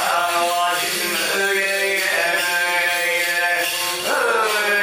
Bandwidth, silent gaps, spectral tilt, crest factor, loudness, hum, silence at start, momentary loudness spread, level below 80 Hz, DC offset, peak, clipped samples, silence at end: 16.5 kHz; none; 0 dB/octave; 14 dB; -18 LUFS; none; 0 s; 2 LU; -62 dBFS; under 0.1%; -6 dBFS; under 0.1%; 0 s